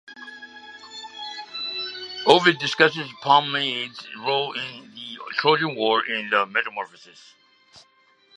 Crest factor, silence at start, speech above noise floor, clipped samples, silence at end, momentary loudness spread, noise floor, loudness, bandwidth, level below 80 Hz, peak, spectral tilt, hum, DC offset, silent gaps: 24 dB; 0.1 s; 37 dB; under 0.1%; 0.55 s; 20 LU; -60 dBFS; -22 LUFS; 11 kHz; -76 dBFS; 0 dBFS; -4 dB/octave; none; under 0.1%; none